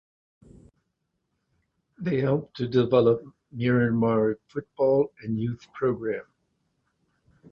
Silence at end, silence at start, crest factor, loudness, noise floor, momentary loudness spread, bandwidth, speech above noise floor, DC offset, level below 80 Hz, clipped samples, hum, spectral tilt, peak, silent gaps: 1.3 s; 2 s; 18 dB; -25 LUFS; -78 dBFS; 12 LU; 6.6 kHz; 53 dB; under 0.1%; -60 dBFS; under 0.1%; none; -9.5 dB/octave; -8 dBFS; none